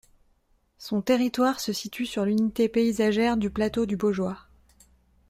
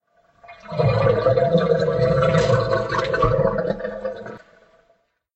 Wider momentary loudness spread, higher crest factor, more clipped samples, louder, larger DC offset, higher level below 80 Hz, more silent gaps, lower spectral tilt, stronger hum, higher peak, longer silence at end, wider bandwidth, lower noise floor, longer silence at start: second, 8 LU vs 13 LU; about the same, 18 dB vs 16 dB; neither; second, -25 LUFS vs -20 LUFS; neither; second, -54 dBFS vs -40 dBFS; neither; second, -5.5 dB/octave vs -7 dB/octave; neither; second, -8 dBFS vs -4 dBFS; about the same, 0.9 s vs 1 s; first, 15.5 kHz vs 8.4 kHz; about the same, -66 dBFS vs -64 dBFS; first, 0.8 s vs 0.5 s